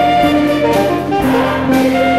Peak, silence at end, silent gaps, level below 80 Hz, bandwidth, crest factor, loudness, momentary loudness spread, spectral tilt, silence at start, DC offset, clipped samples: -2 dBFS; 0 s; none; -38 dBFS; 16 kHz; 10 dB; -13 LUFS; 3 LU; -6 dB/octave; 0 s; 0.7%; under 0.1%